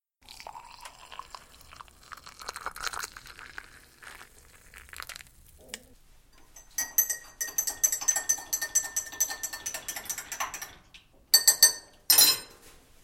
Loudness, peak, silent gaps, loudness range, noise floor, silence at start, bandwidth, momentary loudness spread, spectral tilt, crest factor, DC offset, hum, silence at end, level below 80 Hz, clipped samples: -25 LUFS; -4 dBFS; none; 19 LU; -56 dBFS; 0.4 s; 17 kHz; 26 LU; 2.5 dB/octave; 26 dB; under 0.1%; none; 0.35 s; -60 dBFS; under 0.1%